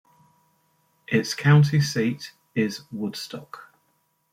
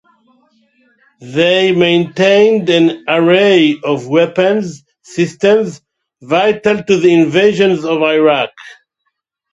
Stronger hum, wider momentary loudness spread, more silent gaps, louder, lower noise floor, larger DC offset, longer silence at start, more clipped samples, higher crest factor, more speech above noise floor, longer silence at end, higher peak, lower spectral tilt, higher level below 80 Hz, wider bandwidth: neither; first, 19 LU vs 9 LU; neither; second, -23 LUFS vs -12 LUFS; about the same, -69 dBFS vs -70 dBFS; neither; about the same, 1.1 s vs 1.2 s; neither; first, 20 dB vs 12 dB; second, 47 dB vs 58 dB; second, 0.7 s vs 0.85 s; second, -6 dBFS vs 0 dBFS; about the same, -6 dB/octave vs -5.5 dB/octave; second, -64 dBFS vs -58 dBFS; first, 15 kHz vs 8 kHz